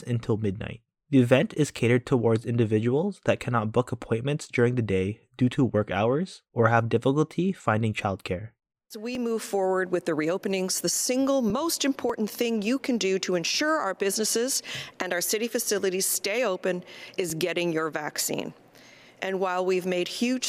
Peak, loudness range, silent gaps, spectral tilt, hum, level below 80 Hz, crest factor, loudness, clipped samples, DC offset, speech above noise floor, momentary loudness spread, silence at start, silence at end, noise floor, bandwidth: -6 dBFS; 4 LU; none; -4.5 dB/octave; none; -62 dBFS; 20 dB; -26 LUFS; under 0.1%; under 0.1%; 27 dB; 8 LU; 0 s; 0 s; -52 dBFS; 16 kHz